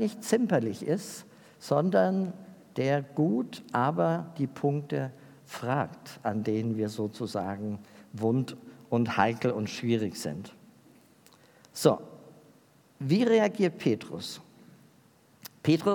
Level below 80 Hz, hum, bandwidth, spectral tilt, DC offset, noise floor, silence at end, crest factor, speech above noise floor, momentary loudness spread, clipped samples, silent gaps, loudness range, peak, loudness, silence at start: -76 dBFS; none; 18 kHz; -6.5 dB/octave; under 0.1%; -61 dBFS; 0 s; 22 dB; 33 dB; 16 LU; under 0.1%; none; 4 LU; -8 dBFS; -29 LUFS; 0 s